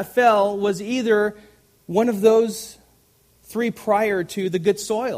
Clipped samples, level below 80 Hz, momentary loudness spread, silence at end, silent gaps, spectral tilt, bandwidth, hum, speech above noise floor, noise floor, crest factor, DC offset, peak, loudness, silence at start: under 0.1%; -62 dBFS; 9 LU; 0 s; none; -5 dB/octave; 15.5 kHz; none; 38 dB; -58 dBFS; 16 dB; under 0.1%; -4 dBFS; -20 LUFS; 0 s